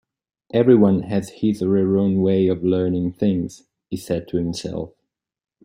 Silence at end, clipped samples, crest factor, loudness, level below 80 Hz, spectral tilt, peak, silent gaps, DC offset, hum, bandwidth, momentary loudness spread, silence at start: 0.8 s; under 0.1%; 18 dB; -20 LUFS; -54 dBFS; -8 dB/octave; -2 dBFS; none; under 0.1%; none; 15 kHz; 15 LU; 0.55 s